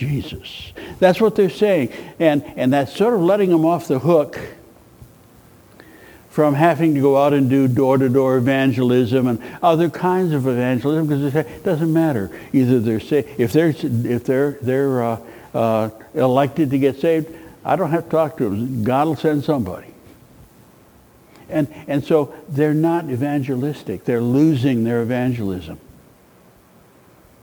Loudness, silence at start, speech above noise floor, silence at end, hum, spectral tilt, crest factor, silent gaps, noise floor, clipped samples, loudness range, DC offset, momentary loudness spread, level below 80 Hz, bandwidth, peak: -18 LUFS; 0 s; 32 dB; 1.65 s; none; -8 dB/octave; 18 dB; none; -50 dBFS; under 0.1%; 5 LU; under 0.1%; 10 LU; -54 dBFS; over 20 kHz; 0 dBFS